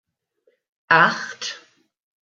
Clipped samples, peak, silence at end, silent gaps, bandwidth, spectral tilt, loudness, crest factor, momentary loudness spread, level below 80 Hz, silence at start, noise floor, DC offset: under 0.1%; -2 dBFS; 0.65 s; none; 7.8 kHz; -3 dB/octave; -19 LUFS; 22 dB; 16 LU; -74 dBFS; 0.9 s; -67 dBFS; under 0.1%